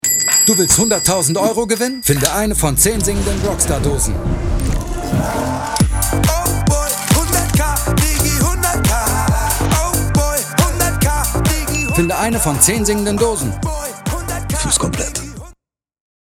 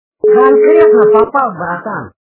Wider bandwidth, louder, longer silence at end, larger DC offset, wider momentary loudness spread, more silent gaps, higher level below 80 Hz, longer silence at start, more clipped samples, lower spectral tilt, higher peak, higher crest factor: first, over 20 kHz vs 3.9 kHz; second, -15 LUFS vs -9 LUFS; first, 0.9 s vs 0.15 s; neither; second, 9 LU vs 13 LU; neither; first, -22 dBFS vs -50 dBFS; second, 0.05 s vs 0.25 s; second, under 0.1% vs 0.4%; second, -4 dB/octave vs -10.5 dB/octave; about the same, 0 dBFS vs 0 dBFS; first, 16 dB vs 10 dB